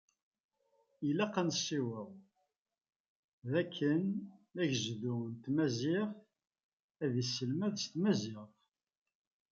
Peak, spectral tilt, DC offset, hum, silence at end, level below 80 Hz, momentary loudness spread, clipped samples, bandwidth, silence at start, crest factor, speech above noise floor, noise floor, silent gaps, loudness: -18 dBFS; -5 dB/octave; under 0.1%; none; 1.05 s; -80 dBFS; 11 LU; under 0.1%; 7.6 kHz; 1 s; 20 dB; 50 dB; -86 dBFS; 2.58-2.65 s, 2.96-3.42 s, 6.63-6.89 s; -36 LUFS